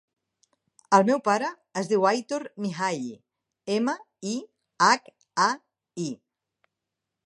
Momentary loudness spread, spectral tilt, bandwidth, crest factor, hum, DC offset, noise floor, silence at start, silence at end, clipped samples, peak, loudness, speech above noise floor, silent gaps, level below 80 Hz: 13 LU; -4 dB/octave; 11 kHz; 24 dB; none; under 0.1%; -85 dBFS; 0.9 s; 1.1 s; under 0.1%; -4 dBFS; -26 LUFS; 61 dB; none; -78 dBFS